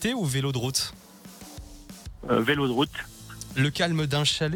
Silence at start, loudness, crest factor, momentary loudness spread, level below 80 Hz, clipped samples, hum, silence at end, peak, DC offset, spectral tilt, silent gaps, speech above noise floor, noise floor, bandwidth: 0 s; -26 LUFS; 18 dB; 21 LU; -50 dBFS; under 0.1%; none; 0 s; -10 dBFS; under 0.1%; -4.5 dB/octave; none; 20 dB; -46 dBFS; 19 kHz